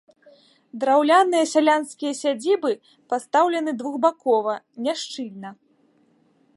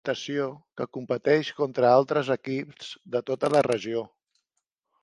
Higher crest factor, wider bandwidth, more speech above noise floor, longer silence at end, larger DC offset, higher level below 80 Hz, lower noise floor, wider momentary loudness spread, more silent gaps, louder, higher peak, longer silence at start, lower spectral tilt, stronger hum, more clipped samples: about the same, 18 dB vs 20 dB; about the same, 11.5 kHz vs 11.5 kHz; second, 40 dB vs 56 dB; about the same, 1.05 s vs 0.95 s; neither; second, -82 dBFS vs -70 dBFS; second, -61 dBFS vs -81 dBFS; about the same, 15 LU vs 15 LU; neither; first, -22 LUFS vs -26 LUFS; about the same, -4 dBFS vs -6 dBFS; first, 0.75 s vs 0.05 s; second, -3 dB/octave vs -5.5 dB/octave; neither; neither